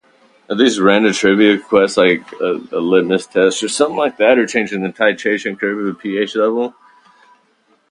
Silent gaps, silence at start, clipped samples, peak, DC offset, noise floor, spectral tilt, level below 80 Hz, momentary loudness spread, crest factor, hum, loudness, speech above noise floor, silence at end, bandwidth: none; 0.5 s; under 0.1%; 0 dBFS; under 0.1%; -58 dBFS; -4 dB/octave; -60 dBFS; 9 LU; 16 dB; none; -15 LUFS; 43 dB; 1.2 s; 11 kHz